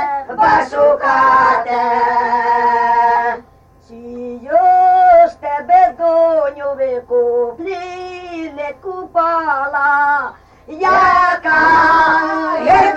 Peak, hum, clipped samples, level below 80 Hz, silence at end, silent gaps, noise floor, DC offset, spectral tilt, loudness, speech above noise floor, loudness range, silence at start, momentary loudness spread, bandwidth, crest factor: -2 dBFS; none; under 0.1%; -46 dBFS; 0 s; none; -46 dBFS; under 0.1%; -5 dB/octave; -13 LUFS; 33 dB; 6 LU; 0 s; 16 LU; 8.2 kHz; 12 dB